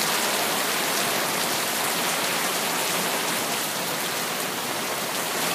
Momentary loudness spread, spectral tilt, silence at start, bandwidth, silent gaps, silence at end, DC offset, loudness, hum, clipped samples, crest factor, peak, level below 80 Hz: 4 LU; -1 dB/octave; 0 s; 15.5 kHz; none; 0 s; under 0.1%; -24 LUFS; none; under 0.1%; 18 dB; -8 dBFS; -70 dBFS